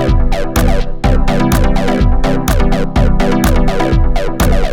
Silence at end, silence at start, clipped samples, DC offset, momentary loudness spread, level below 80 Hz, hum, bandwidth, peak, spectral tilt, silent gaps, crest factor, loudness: 0 s; 0 s; under 0.1%; under 0.1%; 3 LU; -12 dBFS; none; 18 kHz; 0 dBFS; -6 dB/octave; none; 10 dB; -14 LUFS